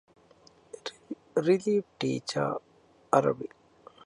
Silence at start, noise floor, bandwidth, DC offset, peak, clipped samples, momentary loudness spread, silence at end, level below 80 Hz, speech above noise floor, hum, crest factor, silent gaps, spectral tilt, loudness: 0.85 s; -59 dBFS; 11.5 kHz; under 0.1%; -8 dBFS; under 0.1%; 16 LU; 0.6 s; -72 dBFS; 32 dB; none; 24 dB; none; -6 dB/octave; -29 LUFS